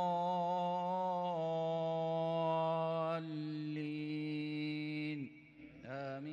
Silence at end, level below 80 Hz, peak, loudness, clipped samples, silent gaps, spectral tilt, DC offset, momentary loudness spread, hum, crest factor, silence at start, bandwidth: 0 s; -82 dBFS; -26 dBFS; -38 LUFS; under 0.1%; none; -8 dB/octave; under 0.1%; 10 LU; none; 12 dB; 0 s; 8.8 kHz